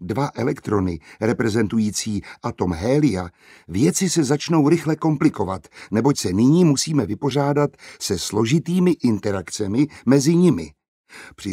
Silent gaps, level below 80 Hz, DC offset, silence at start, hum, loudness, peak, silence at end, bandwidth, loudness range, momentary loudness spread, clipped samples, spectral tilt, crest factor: 10.88-11.04 s; -50 dBFS; under 0.1%; 0 s; none; -20 LUFS; -2 dBFS; 0 s; 16 kHz; 3 LU; 10 LU; under 0.1%; -6 dB/octave; 18 dB